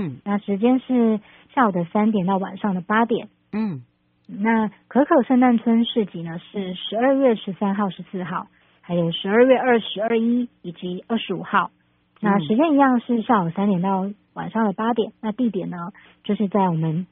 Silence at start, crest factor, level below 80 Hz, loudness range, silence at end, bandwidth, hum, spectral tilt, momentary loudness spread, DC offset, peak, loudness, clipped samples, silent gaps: 0 s; 18 dB; -64 dBFS; 3 LU; 0.05 s; 4.1 kHz; none; -5 dB/octave; 14 LU; under 0.1%; -4 dBFS; -21 LUFS; under 0.1%; none